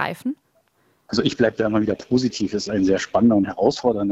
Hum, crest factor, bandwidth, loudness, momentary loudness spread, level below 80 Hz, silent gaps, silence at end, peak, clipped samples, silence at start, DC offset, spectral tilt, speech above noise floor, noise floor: none; 18 dB; 11.5 kHz; -21 LUFS; 8 LU; -52 dBFS; none; 0 s; -2 dBFS; under 0.1%; 0 s; under 0.1%; -5.5 dB/octave; 43 dB; -63 dBFS